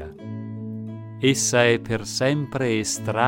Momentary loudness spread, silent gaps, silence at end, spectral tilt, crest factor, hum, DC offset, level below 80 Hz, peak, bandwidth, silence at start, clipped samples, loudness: 16 LU; none; 0 s; -4 dB/octave; 20 dB; none; under 0.1%; -54 dBFS; -4 dBFS; 16.5 kHz; 0 s; under 0.1%; -22 LUFS